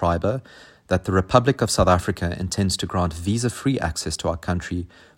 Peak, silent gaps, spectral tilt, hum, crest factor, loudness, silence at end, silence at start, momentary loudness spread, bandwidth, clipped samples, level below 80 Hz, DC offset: 0 dBFS; none; -5 dB/octave; none; 22 dB; -23 LUFS; 0.3 s; 0 s; 8 LU; 16.5 kHz; under 0.1%; -42 dBFS; under 0.1%